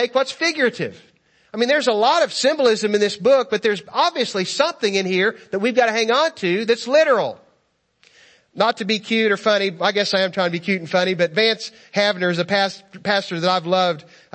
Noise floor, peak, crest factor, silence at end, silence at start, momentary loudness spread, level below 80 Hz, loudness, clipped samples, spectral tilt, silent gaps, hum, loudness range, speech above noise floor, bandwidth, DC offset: -66 dBFS; -2 dBFS; 18 dB; 0.35 s; 0 s; 6 LU; -72 dBFS; -19 LUFS; under 0.1%; -4 dB/octave; none; none; 2 LU; 47 dB; 8.8 kHz; under 0.1%